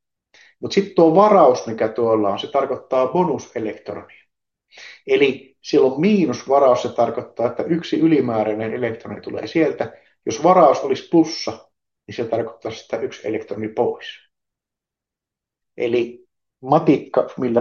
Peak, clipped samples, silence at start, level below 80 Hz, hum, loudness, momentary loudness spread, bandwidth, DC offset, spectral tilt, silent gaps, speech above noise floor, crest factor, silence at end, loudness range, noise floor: -2 dBFS; under 0.1%; 0.6 s; -68 dBFS; none; -19 LUFS; 16 LU; 7.2 kHz; under 0.1%; -6 dB/octave; none; 68 dB; 18 dB; 0 s; 9 LU; -87 dBFS